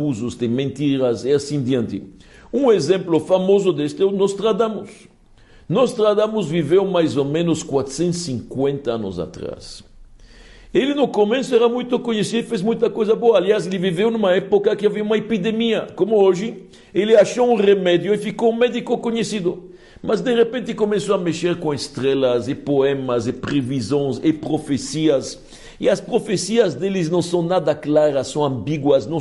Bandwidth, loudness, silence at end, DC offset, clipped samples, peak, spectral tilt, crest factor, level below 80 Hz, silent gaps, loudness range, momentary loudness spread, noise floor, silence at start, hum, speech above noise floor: 11.5 kHz; -19 LUFS; 0 s; under 0.1%; under 0.1%; -4 dBFS; -6 dB/octave; 16 dB; -52 dBFS; none; 4 LU; 8 LU; -48 dBFS; 0 s; none; 30 dB